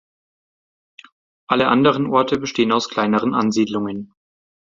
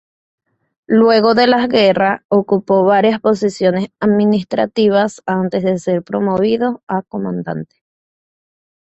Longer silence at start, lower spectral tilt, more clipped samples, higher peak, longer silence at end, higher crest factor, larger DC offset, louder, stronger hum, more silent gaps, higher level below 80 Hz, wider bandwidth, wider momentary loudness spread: first, 1.5 s vs 0.9 s; about the same, -5.5 dB/octave vs -6.5 dB/octave; neither; about the same, -2 dBFS vs 0 dBFS; second, 0.7 s vs 1.2 s; about the same, 18 dB vs 14 dB; neither; second, -18 LUFS vs -15 LUFS; neither; second, none vs 2.25-2.29 s, 6.83-6.87 s; about the same, -58 dBFS vs -56 dBFS; about the same, 7.6 kHz vs 8.2 kHz; second, 7 LU vs 10 LU